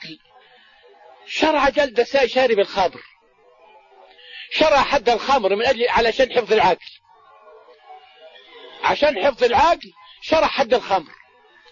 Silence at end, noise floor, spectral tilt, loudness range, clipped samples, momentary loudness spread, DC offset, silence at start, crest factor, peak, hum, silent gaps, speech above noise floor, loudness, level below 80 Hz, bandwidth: 0.65 s; -55 dBFS; -3.5 dB/octave; 4 LU; under 0.1%; 8 LU; under 0.1%; 0 s; 16 dB; -4 dBFS; none; none; 36 dB; -18 LUFS; -48 dBFS; 7.4 kHz